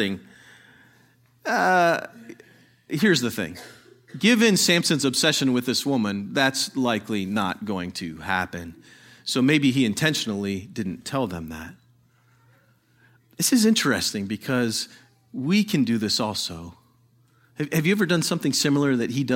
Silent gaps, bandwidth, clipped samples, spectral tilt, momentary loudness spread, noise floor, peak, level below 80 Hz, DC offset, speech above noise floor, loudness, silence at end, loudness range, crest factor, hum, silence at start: none; 16.5 kHz; under 0.1%; -4 dB/octave; 16 LU; -60 dBFS; -4 dBFS; -60 dBFS; under 0.1%; 37 dB; -23 LUFS; 0 s; 5 LU; 20 dB; none; 0 s